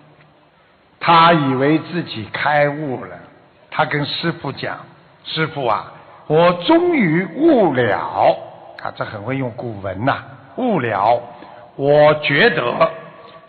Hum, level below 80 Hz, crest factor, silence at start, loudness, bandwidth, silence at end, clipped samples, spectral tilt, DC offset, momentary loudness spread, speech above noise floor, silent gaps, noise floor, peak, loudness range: none; -56 dBFS; 16 dB; 1 s; -17 LUFS; 4.8 kHz; 0.1 s; under 0.1%; -9.5 dB/octave; under 0.1%; 16 LU; 36 dB; none; -53 dBFS; -2 dBFS; 5 LU